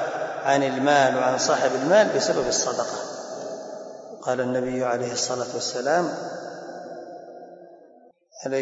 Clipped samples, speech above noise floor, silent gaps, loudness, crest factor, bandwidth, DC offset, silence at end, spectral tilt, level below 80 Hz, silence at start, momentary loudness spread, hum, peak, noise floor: under 0.1%; 31 dB; none; -23 LUFS; 18 dB; 8 kHz; under 0.1%; 0 s; -3 dB/octave; -66 dBFS; 0 s; 19 LU; none; -8 dBFS; -54 dBFS